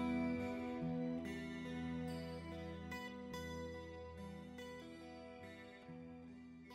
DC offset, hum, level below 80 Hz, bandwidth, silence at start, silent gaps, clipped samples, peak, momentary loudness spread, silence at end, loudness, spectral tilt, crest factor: under 0.1%; none; -64 dBFS; 14 kHz; 0 s; none; under 0.1%; -30 dBFS; 13 LU; 0 s; -47 LUFS; -6.5 dB/octave; 16 dB